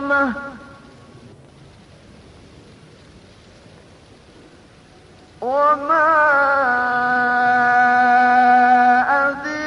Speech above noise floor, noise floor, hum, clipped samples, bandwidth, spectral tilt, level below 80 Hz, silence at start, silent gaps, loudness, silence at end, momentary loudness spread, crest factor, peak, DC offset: 30 dB; -47 dBFS; none; under 0.1%; 10 kHz; -5 dB/octave; -54 dBFS; 0 s; none; -15 LUFS; 0 s; 9 LU; 14 dB; -6 dBFS; under 0.1%